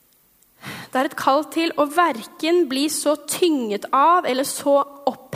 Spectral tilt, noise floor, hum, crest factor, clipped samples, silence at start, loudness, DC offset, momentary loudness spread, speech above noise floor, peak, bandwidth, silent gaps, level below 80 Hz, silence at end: -3 dB/octave; -58 dBFS; none; 18 dB; under 0.1%; 0.65 s; -20 LUFS; under 0.1%; 9 LU; 38 dB; -2 dBFS; 16 kHz; none; -72 dBFS; 0 s